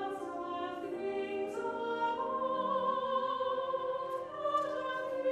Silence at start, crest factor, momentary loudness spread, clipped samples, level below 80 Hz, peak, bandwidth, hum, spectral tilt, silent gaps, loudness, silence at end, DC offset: 0 s; 14 dB; 6 LU; under 0.1%; -76 dBFS; -20 dBFS; 11.5 kHz; none; -5 dB/octave; none; -35 LUFS; 0 s; under 0.1%